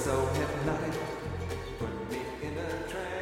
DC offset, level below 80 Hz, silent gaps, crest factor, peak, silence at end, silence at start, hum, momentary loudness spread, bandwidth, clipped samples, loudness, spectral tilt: under 0.1%; -46 dBFS; none; 18 dB; -14 dBFS; 0 s; 0 s; none; 7 LU; 16 kHz; under 0.1%; -34 LUFS; -5.5 dB/octave